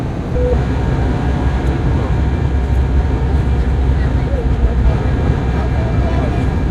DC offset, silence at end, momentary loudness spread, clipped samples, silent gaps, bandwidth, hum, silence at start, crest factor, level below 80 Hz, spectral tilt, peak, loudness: under 0.1%; 0 s; 2 LU; under 0.1%; none; 7.6 kHz; none; 0 s; 12 dB; -16 dBFS; -8.5 dB/octave; -2 dBFS; -16 LUFS